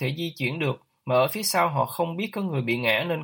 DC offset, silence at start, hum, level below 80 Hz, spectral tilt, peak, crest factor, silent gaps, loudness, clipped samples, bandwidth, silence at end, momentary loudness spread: under 0.1%; 0 s; none; -68 dBFS; -4.5 dB/octave; -8 dBFS; 18 dB; none; -25 LUFS; under 0.1%; 17 kHz; 0 s; 6 LU